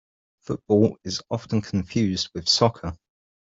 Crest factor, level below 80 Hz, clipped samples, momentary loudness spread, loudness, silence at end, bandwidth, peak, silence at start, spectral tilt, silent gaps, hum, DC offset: 20 dB; -54 dBFS; under 0.1%; 14 LU; -23 LUFS; 0.5 s; 7.8 kHz; -4 dBFS; 0.5 s; -5 dB/octave; none; none; under 0.1%